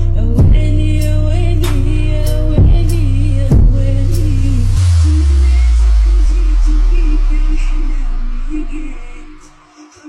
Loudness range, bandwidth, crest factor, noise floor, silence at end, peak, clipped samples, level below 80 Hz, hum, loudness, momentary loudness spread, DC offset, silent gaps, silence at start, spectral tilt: 6 LU; 12.5 kHz; 8 dB; -40 dBFS; 0 s; -2 dBFS; under 0.1%; -12 dBFS; none; -14 LUFS; 12 LU; under 0.1%; none; 0 s; -7.5 dB/octave